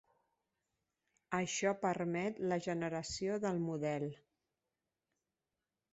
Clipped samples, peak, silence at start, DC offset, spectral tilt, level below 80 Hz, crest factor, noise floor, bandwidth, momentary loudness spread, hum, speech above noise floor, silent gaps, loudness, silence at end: under 0.1%; -20 dBFS; 1.3 s; under 0.1%; -5 dB/octave; -72 dBFS; 20 dB; under -90 dBFS; 8 kHz; 5 LU; none; over 53 dB; none; -38 LUFS; 1.8 s